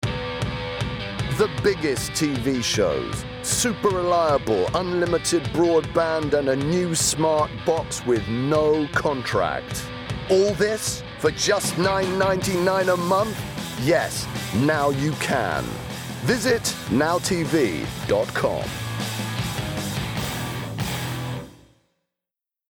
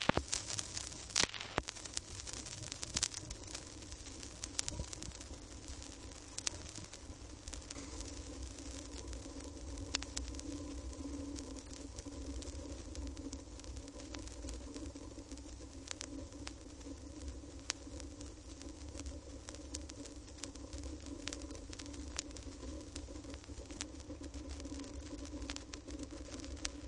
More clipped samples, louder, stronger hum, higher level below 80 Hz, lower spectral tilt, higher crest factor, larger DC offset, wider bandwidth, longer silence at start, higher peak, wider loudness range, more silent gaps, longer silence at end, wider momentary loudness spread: neither; first, -23 LUFS vs -45 LUFS; neither; first, -44 dBFS vs -52 dBFS; first, -4.5 dB/octave vs -3 dB/octave; second, 14 dB vs 38 dB; neither; first, over 20 kHz vs 11.5 kHz; about the same, 0 s vs 0 s; about the same, -8 dBFS vs -8 dBFS; second, 5 LU vs 8 LU; neither; first, 1.2 s vs 0 s; about the same, 8 LU vs 10 LU